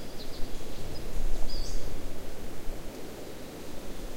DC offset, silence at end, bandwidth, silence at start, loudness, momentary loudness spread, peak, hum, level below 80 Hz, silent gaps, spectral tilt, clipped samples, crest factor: under 0.1%; 0 s; 15.5 kHz; 0 s; -41 LUFS; 5 LU; -12 dBFS; none; -34 dBFS; none; -4.5 dB/octave; under 0.1%; 14 dB